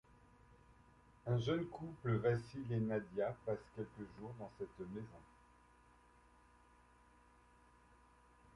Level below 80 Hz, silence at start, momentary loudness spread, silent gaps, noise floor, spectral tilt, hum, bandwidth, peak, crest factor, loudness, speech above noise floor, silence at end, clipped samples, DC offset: -68 dBFS; 1.25 s; 14 LU; none; -68 dBFS; -8 dB/octave; none; 11 kHz; -24 dBFS; 20 dB; -43 LUFS; 26 dB; 3.3 s; under 0.1%; under 0.1%